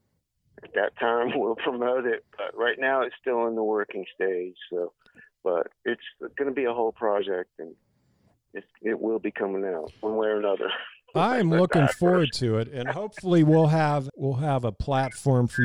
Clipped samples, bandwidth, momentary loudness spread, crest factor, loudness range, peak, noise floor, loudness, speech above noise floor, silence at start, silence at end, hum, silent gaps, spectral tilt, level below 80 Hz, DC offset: under 0.1%; 11.5 kHz; 12 LU; 16 dB; 7 LU; -10 dBFS; -73 dBFS; -26 LUFS; 47 dB; 0.65 s; 0 s; none; none; -7 dB/octave; -54 dBFS; under 0.1%